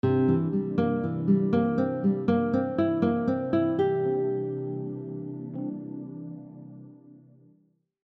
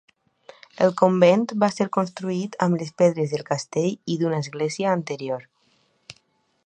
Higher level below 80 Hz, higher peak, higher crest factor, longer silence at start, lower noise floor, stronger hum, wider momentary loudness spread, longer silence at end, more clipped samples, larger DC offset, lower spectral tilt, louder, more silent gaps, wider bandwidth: first, -64 dBFS vs -70 dBFS; second, -12 dBFS vs -2 dBFS; about the same, 16 dB vs 20 dB; second, 0.05 s vs 0.8 s; about the same, -66 dBFS vs -66 dBFS; neither; first, 16 LU vs 10 LU; first, 0.9 s vs 0.55 s; neither; neither; first, -10.5 dB/octave vs -6 dB/octave; second, -27 LUFS vs -23 LUFS; neither; second, 5.2 kHz vs 9.8 kHz